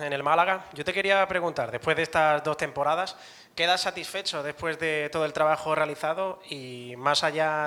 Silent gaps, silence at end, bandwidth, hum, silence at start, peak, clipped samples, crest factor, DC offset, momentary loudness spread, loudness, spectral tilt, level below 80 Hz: none; 0 s; 18 kHz; none; 0 s; -6 dBFS; under 0.1%; 20 dB; under 0.1%; 9 LU; -26 LUFS; -3.5 dB/octave; -64 dBFS